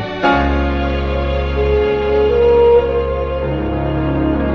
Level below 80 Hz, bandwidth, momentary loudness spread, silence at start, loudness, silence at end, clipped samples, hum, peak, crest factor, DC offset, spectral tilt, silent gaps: -22 dBFS; 6.4 kHz; 8 LU; 0 s; -15 LUFS; 0 s; under 0.1%; none; -2 dBFS; 12 dB; 0.2%; -8.5 dB/octave; none